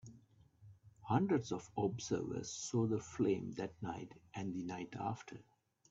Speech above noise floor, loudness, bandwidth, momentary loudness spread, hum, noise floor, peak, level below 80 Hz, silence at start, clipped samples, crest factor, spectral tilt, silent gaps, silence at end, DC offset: 26 dB; -40 LUFS; 8 kHz; 13 LU; none; -66 dBFS; -18 dBFS; -72 dBFS; 0.05 s; under 0.1%; 22 dB; -6 dB/octave; none; 0.5 s; under 0.1%